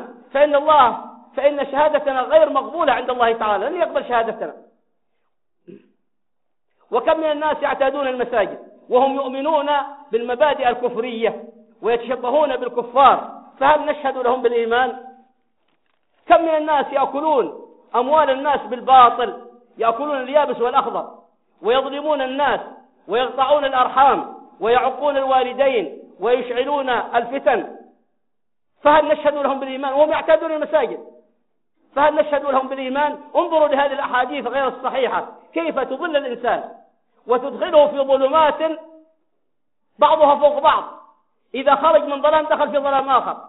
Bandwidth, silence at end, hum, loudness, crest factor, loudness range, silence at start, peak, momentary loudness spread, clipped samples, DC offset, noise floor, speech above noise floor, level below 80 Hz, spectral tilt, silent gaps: 4.1 kHz; 0 s; none; -18 LUFS; 18 dB; 5 LU; 0 s; -2 dBFS; 11 LU; under 0.1%; under 0.1%; -81 dBFS; 63 dB; -58 dBFS; -1 dB/octave; none